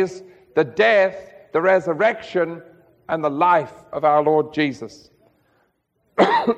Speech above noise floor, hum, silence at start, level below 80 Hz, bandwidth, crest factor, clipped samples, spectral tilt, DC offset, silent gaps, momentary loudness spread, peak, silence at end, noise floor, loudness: 48 dB; none; 0 s; -64 dBFS; 8.8 kHz; 20 dB; under 0.1%; -6 dB/octave; under 0.1%; none; 15 LU; 0 dBFS; 0 s; -67 dBFS; -19 LUFS